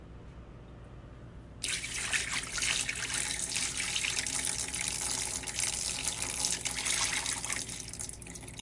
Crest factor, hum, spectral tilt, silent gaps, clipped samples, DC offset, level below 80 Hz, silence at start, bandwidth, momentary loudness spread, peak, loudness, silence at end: 24 dB; none; -0.5 dB/octave; none; under 0.1%; under 0.1%; -52 dBFS; 0 s; 11.5 kHz; 21 LU; -12 dBFS; -32 LUFS; 0 s